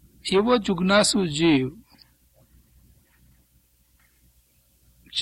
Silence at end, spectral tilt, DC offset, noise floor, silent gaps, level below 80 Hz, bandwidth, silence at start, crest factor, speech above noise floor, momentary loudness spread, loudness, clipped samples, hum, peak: 0 s; -4.5 dB/octave; under 0.1%; -62 dBFS; none; -54 dBFS; 15.5 kHz; 0.25 s; 20 dB; 42 dB; 7 LU; -21 LUFS; under 0.1%; none; -6 dBFS